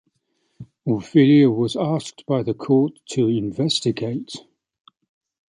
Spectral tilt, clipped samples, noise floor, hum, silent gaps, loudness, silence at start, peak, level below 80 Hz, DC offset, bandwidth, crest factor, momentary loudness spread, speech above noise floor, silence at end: -6.5 dB/octave; under 0.1%; -70 dBFS; none; none; -20 LUFS; 0.6 s; -4 dBFS; -60 dBFS; under 0.1%; 11 kHz; 18 dB; 14 LU; 51 dB; 1.1 s